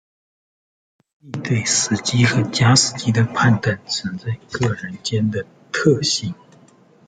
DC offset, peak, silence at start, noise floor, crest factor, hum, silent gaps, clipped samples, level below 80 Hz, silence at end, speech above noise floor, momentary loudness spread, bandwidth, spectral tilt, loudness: under 0.1%; -2 dBFS; 1.25 s; -51 dBFS; 18 dB; none; none; under 0.1%; -54 dBFS; 0.75 s; 32 dB; 13 LU; 9.6 kHz; -4 dB/octave; -19 LUFS